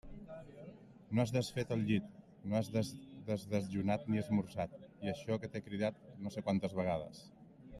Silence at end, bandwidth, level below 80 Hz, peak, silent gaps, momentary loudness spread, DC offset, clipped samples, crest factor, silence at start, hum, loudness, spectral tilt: 0 s; 13 kHz; -66 dBFS; -20 dBFS; none; 17 LU; under 0.1%; under 0.1%; 18 dB; 0.05 s; none; -38 LUFS; -7 dB/octave